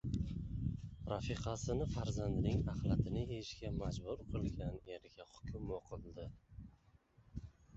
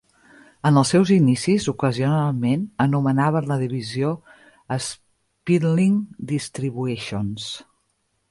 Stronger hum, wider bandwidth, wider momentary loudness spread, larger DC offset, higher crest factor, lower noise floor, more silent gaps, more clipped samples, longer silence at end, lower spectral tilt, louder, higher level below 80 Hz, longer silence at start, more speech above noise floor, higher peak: neither; second, 8 kHz vs 11.5 kHz; first, 16 LU vs 13 LU; neither; about the same, 18 dB vs 16 dB; about the same, -69 dBFS vs -70 dBFS; neither; neither; second, 0 s vs 0.7 s; about the same, -7.5 dB/octave vs -6.5 dB/octave; second, -42 LUFS vs -21 LUFS; first, -50 dBFS vs -56 dBFS; second, 0.05 s vs 0.65 s; second, 28 dB vs 50 dB; second, -22 dBFS vs -6 dBFS